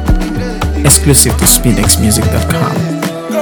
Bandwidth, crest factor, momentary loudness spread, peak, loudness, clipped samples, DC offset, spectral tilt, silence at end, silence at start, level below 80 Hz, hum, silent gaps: over 20 kHz; 10 dB; 10 LU; 0 dBFS; -10 LUFS; 1%; under 0.1%; -4 dB/octave; 0 s; 0 s; -18 dBFS; none; none